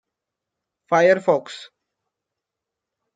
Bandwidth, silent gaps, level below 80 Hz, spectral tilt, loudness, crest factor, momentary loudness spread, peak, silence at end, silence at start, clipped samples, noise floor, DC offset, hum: 9.2 kHz; none; -76 dBFS; -5.5 dB/octave; -19 LUFS; 20 dB; 21 LU; -4 dBFS; 1.5 s; 0.9 s; under 0.1%; -85 dBFS; under 0.1%; none